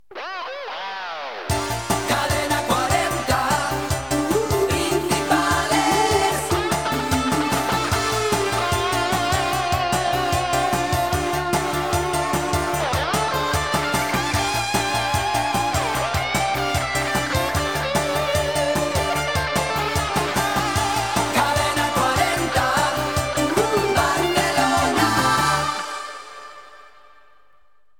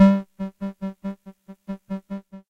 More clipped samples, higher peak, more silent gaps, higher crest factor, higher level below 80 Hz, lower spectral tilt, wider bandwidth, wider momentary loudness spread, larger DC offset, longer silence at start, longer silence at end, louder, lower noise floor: neither; about the same, -4 dBFS vs -4 dBFS; neither; about the same, 18 dB vs 20 dB; first, -38 dBFS vs -58 dBFS; second, -3.5 dB/octave vs -9.5 dB/octave; first, 19 kHz vs 5.8 kHz; second, 5 LU vs 16 LU; first, 0.3% vs under 0.1%; about the same, 0.1 s vs 0 s; first, 1.1 s vs 0.1 s; first, -21 LUFS vs -28 LUFS; first, -63 dBFS vs -46 dBFS